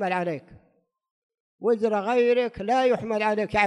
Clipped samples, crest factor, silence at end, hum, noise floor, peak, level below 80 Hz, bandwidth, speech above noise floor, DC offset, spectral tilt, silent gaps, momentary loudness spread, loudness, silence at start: under 0.1%; 16 dB; 0 s; none; -67 dBFS; -8 dBFS; -58 dBFS; 10 kHz; 43 dB; under 0.1%; -6 dB/octave; 1.11-1.29 s, 1.40-1.59 s; 8 LU; -24 LUFS; 0 s